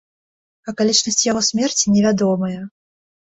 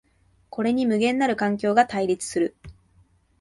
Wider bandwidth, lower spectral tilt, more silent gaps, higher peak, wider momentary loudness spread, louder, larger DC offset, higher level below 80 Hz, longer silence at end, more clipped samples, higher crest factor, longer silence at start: second, 8.2 kHz vs 11.5 kHz; second, -3.5 dB/octave vs -5 dB/octave; neither; first, -2 dBFS vs -6 dBFS; first, 17 LU vs 7 LU; first, -17 LUFS vs -23 LUFS; neither; about the same, -56 dBFS vs -58 dBFS; about the same, 0.65 s vs 0.7 s; neither; about the same, 18 dB vs 18 dB; about the same, 0.65 s vs 0.55 s